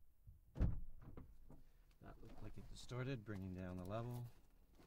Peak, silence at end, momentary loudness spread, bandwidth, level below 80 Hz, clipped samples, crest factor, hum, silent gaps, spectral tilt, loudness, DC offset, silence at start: -26 dBFS; 0 s; 22 LU; 16 kHz; -54 dBFS; under 0.1%; 22 dB; none; none; -7 dB/octave; -50 LUFS; under 0.1%; 0 s